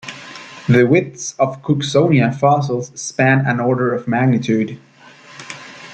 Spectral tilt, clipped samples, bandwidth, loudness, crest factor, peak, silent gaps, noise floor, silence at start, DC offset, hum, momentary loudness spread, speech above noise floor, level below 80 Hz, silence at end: -6 dB/octave; under 0.1%; 9 kHz; -16 LUFS; 16 dB; -2 dBFS; none; -43 dBFS; 0.05 s; under 0.1%; none; 19 LU; 27 dB; -58 dBFS; 0 s